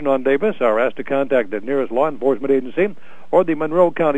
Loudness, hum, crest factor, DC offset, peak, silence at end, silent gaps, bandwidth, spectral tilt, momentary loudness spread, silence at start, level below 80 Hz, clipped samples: -19 LUFS; none; 16 dB; 4%; -2 dBFS; 0 s; none; 8.8 kHz; -8 dB/octave; 5 LU; 0 s; -62 dBFS; under 0.1%